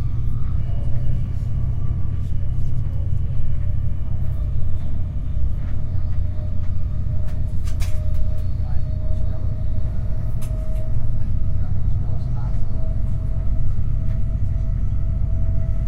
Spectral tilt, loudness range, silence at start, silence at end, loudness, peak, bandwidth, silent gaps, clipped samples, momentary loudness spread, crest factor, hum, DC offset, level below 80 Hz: -9 dB/octave; 1 LU; 0 s; 0 s; -25 LUFS; -6 dBFS; 2.4 kHz; none; under 0.1%; 2 LU; 10 dB; none; under 0.1%; -22 dBFS